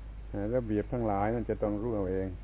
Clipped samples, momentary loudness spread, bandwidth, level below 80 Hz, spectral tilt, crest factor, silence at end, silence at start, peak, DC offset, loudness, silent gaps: under 0.1%; 3 LU; 4 kHz; -42 dBFS; -9 dB/octave; 14 dB; 0 s; 0 s; -16 dBFS; under 0.1%; -32 LUFS; none